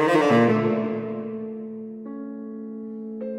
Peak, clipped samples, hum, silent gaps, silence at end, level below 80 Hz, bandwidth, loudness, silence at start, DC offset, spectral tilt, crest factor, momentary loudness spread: -8 dBFS; under 0.1%; none; none; 0 s; -72 dBFS; 11.5 kHz; -24 LUFS; 0 s; under 0.1%; -7 dB/octave; 16 dB; 17 LU